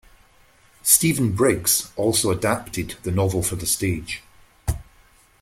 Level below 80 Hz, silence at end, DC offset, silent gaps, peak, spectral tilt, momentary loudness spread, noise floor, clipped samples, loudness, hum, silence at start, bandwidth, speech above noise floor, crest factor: -42 dBFS; 0.6 s; under 0.1%; none; 0 dBFS; -3.5 dB/octave; 14 LU; -55 dBFS; under 0.1%; -21 LUFS; none; 0.85 s; 16.5 kHz; 34 dB; 24 dB